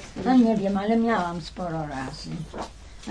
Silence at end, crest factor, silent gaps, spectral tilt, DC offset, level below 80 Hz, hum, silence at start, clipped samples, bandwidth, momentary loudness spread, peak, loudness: 0 s; 16 dB; none; -6.5 dB/octave; under 0.1%; -46 dBFS; none; 0 s; under 0.1%; 10 kHz; 17 LU; -10 dBFS; -25 LUFS